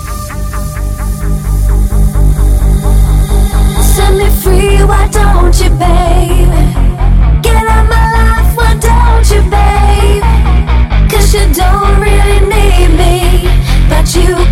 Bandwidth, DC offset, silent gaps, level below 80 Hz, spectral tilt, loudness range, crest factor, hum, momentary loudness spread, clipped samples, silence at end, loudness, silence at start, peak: 16 kHz; 1%; none; -8 dBFS; -5.5 dB/octave; 2 LU; 6 dB; none; 4 LU; 0.1%; 0 s; -9 LUFS; 0 s; 0 dBFS